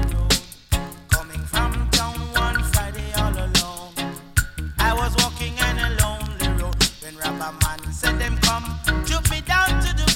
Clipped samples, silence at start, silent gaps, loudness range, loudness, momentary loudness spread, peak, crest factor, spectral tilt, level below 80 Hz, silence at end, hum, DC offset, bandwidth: under 0.1%; 0 s; none; 1 LU; -22 LUFS; 7 LU; -2 dBFS; 18 dB; -3 dB/octave; -26 dBFS; 0 s; none; under 0.1%; 17 kHz